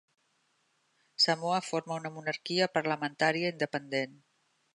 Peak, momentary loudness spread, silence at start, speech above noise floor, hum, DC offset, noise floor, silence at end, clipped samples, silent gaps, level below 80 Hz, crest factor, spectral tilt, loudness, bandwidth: -12 dBFS; 9 LU; 1.2 s; 42 dB; none; under 0.1%; -74 dBFS; 0.6 s; under 0.1%; none; -80 dBFS; 20 dB; -4 dB/octave; -31 LUFS; 11.5 kHz